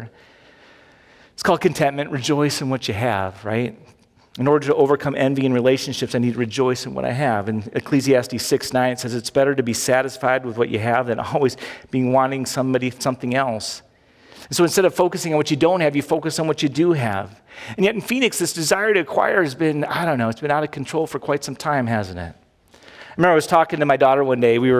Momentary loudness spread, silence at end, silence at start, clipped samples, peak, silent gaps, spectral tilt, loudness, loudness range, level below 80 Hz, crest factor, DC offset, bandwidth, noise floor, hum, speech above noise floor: 8 LU; 0 s; 0 s; under 0.1%; -2 dBFS; none; -5 dB/octave; -20 LUFS; 3 LU; -54 dBFS; 18 dB; under 0.1%; 16 kHz; -51 dBFS; none; 31 dB